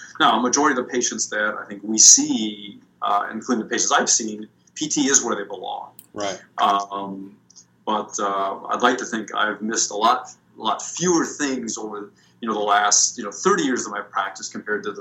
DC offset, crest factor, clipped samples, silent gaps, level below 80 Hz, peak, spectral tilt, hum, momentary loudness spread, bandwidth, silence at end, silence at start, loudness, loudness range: under 0.1%; 22 dB; under 0.1%; none; -74 dBFS; 0 dBFS; -1.5 dB/octave; none; 15 LU; 16.5 kHz; 0 s; 0 s; -20 LUFS; 7 LU